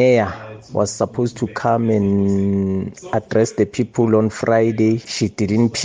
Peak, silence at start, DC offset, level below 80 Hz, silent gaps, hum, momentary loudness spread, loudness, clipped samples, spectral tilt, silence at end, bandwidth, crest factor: -2 dBFS; 0 s; under 0.1%; -54 dBFS; none; none; 7 LU; -18 LUFS; under 0.1%; -6 dB/octave; 0 s; 9.6 kHz; 14 dB